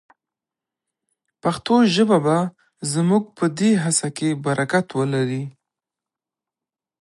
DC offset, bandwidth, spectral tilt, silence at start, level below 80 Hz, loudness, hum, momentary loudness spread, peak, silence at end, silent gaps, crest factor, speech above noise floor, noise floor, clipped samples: under 0.1%; 11.5 kHz; -5 dB/octave; 1.45 s; -66 dBFS; -20 LUFS; none; 9 LU; -4 dBFS; 1.5 s; none; 18 dB; 70 dB; -89 dBFS; under 0.1%